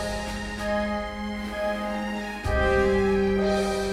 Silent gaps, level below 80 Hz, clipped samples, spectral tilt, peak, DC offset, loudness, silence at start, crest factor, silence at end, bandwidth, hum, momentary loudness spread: none; -36 dBFS; under 0.1%; -5.5 dB/octave; -10 dBFS; under 0.1%; -26 LUFS; 0 s; 16 dB; 0 s; 15 kHz; none; 9 LU